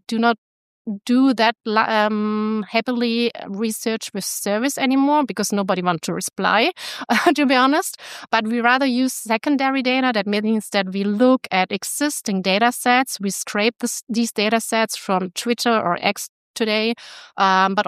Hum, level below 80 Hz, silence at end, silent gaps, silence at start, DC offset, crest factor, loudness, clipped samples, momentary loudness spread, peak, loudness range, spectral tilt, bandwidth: none; -72 dBFS; 0 s; 0.38-0.85 s, 14.03-14.07 s, 16.29-16.54 s; 0.1 s; under 0.1%; 18 dB; -19 LUFS; under 0.1%; 8 LU; -2 dBFS; 2 LU; -3.5 dB/octave; 15.5 kHz